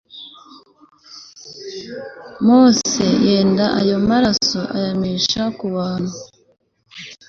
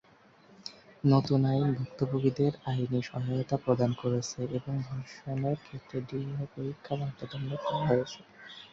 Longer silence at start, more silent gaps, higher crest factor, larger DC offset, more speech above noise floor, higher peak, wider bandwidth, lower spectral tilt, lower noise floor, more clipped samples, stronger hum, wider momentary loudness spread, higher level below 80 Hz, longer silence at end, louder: second, 0.15 s vs 0.65 s; neither; about the same, 16 dB vs 18 dB; neither; about the same, 29 dB vs 29 dB; first, -2 dBFS vs -12 dBFS; about the same, 7.6 kHz vs 7.6 kHz; second, -4.5 dB/octave vs -7.5 dB/octave; second, -45 dBFS vs -60 dBFS; neither; neither; first, 23 LU vs 14 LU; first, -50 dBFS vs -62 dBFS; about the same, 0.15 s vs 0.05 s; first, -16 LUFS vs -31 LUFS